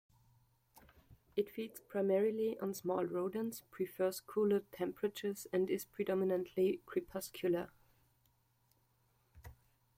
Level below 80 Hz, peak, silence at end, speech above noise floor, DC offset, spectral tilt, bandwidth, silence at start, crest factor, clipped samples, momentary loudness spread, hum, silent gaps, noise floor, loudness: -72 dBFS; -24 dBFS; 0.45 s; 38 dB; under 0.1%; -6 dB/octave; 16.5 kHz; 0.75 s; 16 dB; under 0.1%; 8 LU; none; none; -76 dBFS; -38 LUFS